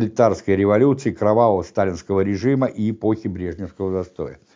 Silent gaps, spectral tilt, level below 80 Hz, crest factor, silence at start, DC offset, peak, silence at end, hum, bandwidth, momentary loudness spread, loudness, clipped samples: none; -8 dB/octave; -44 dBFS; 16 dB; 0 s; under 0.1%; -4 dBFS; 0.2 s; none; 7.6 kHz; 11 LU; -20 LUFS; under 0.1%